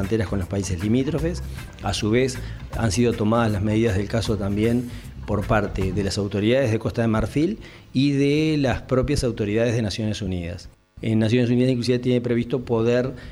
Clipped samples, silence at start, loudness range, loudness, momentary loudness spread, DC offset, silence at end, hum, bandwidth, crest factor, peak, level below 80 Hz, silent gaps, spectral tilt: under 0.1%; 0 s; 1 LU; -22 LUFS; 8 LU; under 0.1%; 0 s; none; 15 kHz; 18 dB; -4 dBFS; -38 dBFS; none; -6.5 dB/octave